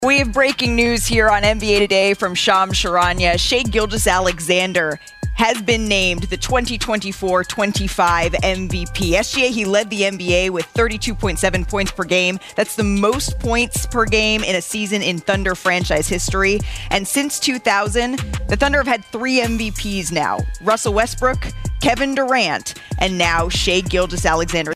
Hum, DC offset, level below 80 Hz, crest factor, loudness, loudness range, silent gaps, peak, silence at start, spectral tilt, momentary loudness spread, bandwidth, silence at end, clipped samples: none; under 0.1%; -30 dBFS; 18 dB; -17 LUFS; 3 LU; none; 0 dBFS; 0 s; -3.5 dB/octave; 6 LU; 15.5 kHz; 0 s; under 0.1%